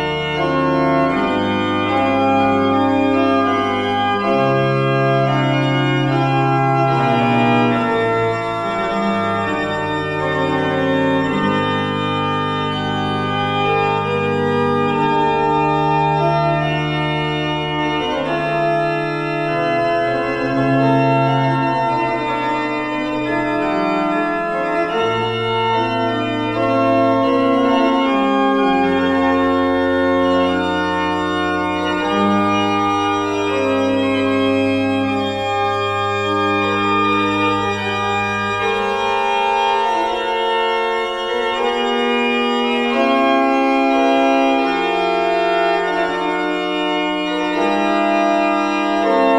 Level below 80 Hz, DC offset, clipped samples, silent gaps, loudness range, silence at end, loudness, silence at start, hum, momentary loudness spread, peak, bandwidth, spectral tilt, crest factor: -48 dBFS; under 0.1%; under 0.1%; none; 3 LU; 0 s; -17 LUFS; 0 s; none; 4 LU; -4 dBFS; 10.5 kHz; -6.5 dB/octave; 14 dB